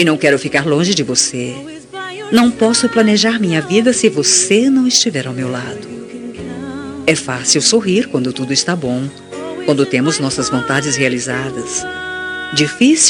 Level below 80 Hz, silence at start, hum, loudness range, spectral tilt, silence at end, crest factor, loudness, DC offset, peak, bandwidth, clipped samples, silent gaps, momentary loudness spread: -52 dBFS; 0 s; none; 4 LU; -3 dB/octave; 0 s; 14 dB; -14 LUFS; under 0.1%; 0 dBFS; 12 kHz; under 0.1%; none; 15 LU